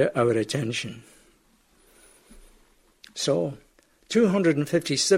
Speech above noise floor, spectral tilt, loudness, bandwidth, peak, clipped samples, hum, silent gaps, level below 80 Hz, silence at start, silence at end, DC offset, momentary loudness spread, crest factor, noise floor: 38 dB; -4.5 dB/octave; -24 LUFS; 16 kHz; -8 dBFS; under 0.1%; none; none; -60 dBFS; 0 s; 0 s; under 0.1%; 17 LU; 18 dB; -62 dBFS